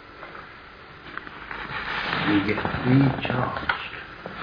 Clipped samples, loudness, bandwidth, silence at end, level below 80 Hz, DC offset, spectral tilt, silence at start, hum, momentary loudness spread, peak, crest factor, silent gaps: under 0.1%; -25 LUFS; 5.2 kHz; 0 s; -48 dBFS; under 0.1%; -8 dB/octave; 0 s; none; 21 LU; -6 dBFS; 20 dB; none